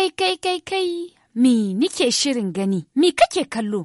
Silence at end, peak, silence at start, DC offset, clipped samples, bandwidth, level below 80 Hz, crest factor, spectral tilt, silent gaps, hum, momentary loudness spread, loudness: 0 s; -4 dBFS; 0 s; under 0.1%; under 0.1%; 11.5 kHz; -60 dBFS; 16 dB; -4 dB/octave; none; none; 7 LU; -20 LUFS